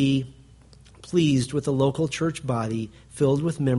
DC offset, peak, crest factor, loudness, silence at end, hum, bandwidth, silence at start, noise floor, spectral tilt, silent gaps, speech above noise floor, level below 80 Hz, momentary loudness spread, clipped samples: under 0.1%; -8 dBFS; 16 dB; -24 LUFS; 0 s; none; 11.5 kHz; 0 s; -51 dBFS; -6.5 dB/octave; none; 27 dB; -52 dBFS; 8 LU; under 0.1%